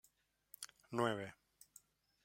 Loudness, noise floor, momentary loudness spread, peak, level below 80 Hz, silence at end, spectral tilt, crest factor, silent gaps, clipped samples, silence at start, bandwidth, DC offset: -43 LUFS; -77 dBFS; 24 LU; -22 dBFS; -84 dBFS; 0.9 s; -5 dB/octave; 26 dB; none; under 0.1%; 0.6 s; 16.5 kHz; under 0.1%